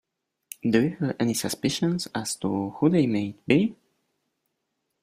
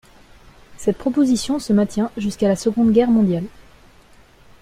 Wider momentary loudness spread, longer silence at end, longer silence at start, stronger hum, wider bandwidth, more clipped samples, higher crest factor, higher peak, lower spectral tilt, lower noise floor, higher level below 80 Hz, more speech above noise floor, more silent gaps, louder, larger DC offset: about the same, 7 LU vs 8 LU; first, 1.3 s vs 1.1 s; about the same, 0.65 s vs 0.7 s; neither; about the same, 15.5 kHz vs 14.5 kHz; neither; first, 22 dB vs 16 dB; about the same, -6 dBFS vs -4 dBFS; about the same, -5.5 dB/octave vs -6.5 dB/octave; first, -79 dBFS vs -49 dBFS; second, -62 dBFS vs -48 dBFS; first, 55 dB vs 31 dB; neither; second, -25 LUFS vs -19 LUFS; neither